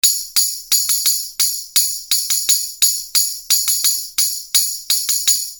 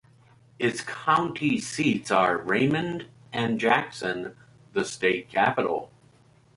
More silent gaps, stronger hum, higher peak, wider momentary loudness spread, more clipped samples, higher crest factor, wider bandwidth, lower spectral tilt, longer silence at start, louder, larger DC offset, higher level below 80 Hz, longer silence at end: neither; neither; first, 0 dBFS vs -8 dBFS; second, 4 LU vs 10 LU; neither; about the same, 18 dB vs 20 dB; first, over 20 kHz vs 11.5 kHz; second, 5 dB/octave vs -5 dB/octave; second, 0.05 s vs 0.6 s; first, -15 LUFS vs -26 LUFS; neither; about the same, -58 dBFS vs -62 dBFS; second, 0 s vs 0.7 s